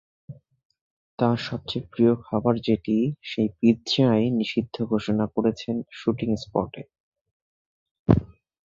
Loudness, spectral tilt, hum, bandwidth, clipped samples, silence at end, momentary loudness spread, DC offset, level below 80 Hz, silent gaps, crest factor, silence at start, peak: -24 LUFS; -7.5 dB/octave; none; 7.6 kHz; under 0.1%; 0.4 s; 9 LU; under 0.1%; -48 dBFS; 0.65-0.70 s, 0.81-1.18 s, 7.00-7.12 s, 7.21-7.25 s, 7.31-8.06 s; 22 dB; 0.3 s; -2 dBFS